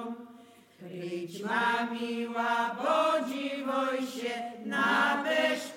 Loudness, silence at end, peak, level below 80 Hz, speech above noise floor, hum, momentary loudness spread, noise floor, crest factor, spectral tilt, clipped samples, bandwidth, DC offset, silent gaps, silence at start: -30 LUFS; 0 s; -16 dBFS; -88 dBFS; 25 dB; none; 11 LU; -55 dBFS; 16 dB; -4 dB/octave; under 0.1%; 17 kHz; under 0.1%; none; 0 s